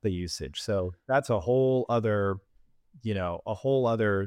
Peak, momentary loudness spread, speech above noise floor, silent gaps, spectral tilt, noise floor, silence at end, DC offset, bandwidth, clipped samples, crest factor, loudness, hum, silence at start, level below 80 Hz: -12 dBFS; 9 LU; 32 dB; none; -6.5 dB/octave; -59 dBFS; 0 s; under 0.1%; 15 kHz; under 0.1%; 16 dB; -28 LUFS; none; 0.05 s; -54 dBFS